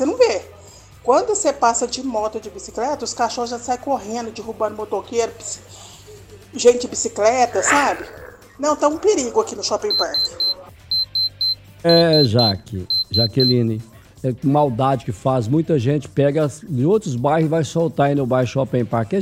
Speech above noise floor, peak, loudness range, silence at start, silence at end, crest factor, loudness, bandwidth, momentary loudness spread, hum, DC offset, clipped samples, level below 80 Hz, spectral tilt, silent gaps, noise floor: 25 dB; -2 dBFS; 7 LU; 0 s; 0 s; 16 dB; -19 LUFS; 15.5 kHz; 11 LU; none; under 0.1%; under 0.1%; -52 dBFS; -4.5 dB/octave; none; -43 dBFS